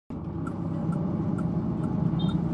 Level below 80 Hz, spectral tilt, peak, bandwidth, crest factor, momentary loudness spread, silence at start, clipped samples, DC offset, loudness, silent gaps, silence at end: -46 dBFS; -9.5 dB/octave; -14 dBFS; 9 kHz; 14 dB; 7 LU; 0.1 s; under 0.1%; under 0.1%; -29 LUFS; none; 0 s